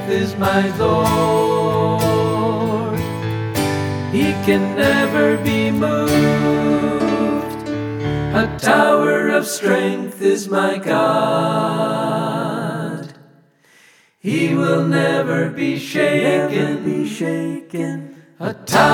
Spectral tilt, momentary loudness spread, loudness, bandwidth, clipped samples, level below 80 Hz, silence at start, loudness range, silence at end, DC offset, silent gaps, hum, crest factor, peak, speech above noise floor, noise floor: -6 dB/octave; 9 LU; -18 LUFS; 19.5 kHz; under 0.1%; -46 dBFS; 0 s; 4 LU; 0 s; under 0.1%; none; none; 18 dB; 0 dBFS; 35 dB; -52 dBFS